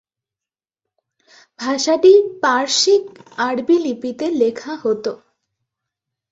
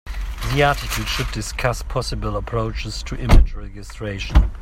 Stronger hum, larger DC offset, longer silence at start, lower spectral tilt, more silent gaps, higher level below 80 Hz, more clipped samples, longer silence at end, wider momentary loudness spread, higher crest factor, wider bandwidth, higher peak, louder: neither; neither; first, 1.6 s vs 0.05 s; second, -2.5 dB/octave vs -5 dB/octave; neither; second, -66 dBFS vs -22 dBFS; neither; first, 1.15 s vs 0 s; about the same, 13 LU vs 12 LU; about the same, 18 dB vs 18 dB; second, 7.8 kHz vs 16 kHz; about the same, -2 dBFS vs 0 dBFS; first, -17 LUFS vs -22 LUFS